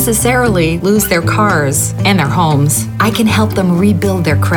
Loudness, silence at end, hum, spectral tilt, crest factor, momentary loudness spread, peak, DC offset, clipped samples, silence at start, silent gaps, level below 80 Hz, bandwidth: -12 LUFS; 0 s; none; -5 dB/octave; 10 dB; 2 LU; -2 dBFS; under 0.1%; under 0.1%; 0 s; none; -34 dBFS; over 20 kHz